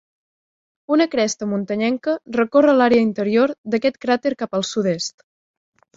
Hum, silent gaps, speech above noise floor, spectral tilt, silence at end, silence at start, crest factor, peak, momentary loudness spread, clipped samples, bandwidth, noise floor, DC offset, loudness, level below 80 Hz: none; 3.58-3.64 s; over 72 dB; -5 dB/octave; 0.9 s; 0.9 s; 18 dB; -2 dBFS; 9 LU; under 0.1%; 7.8 kHz; under -90 dBFS; under 0.1%; -19 LUFS; -62 dBFS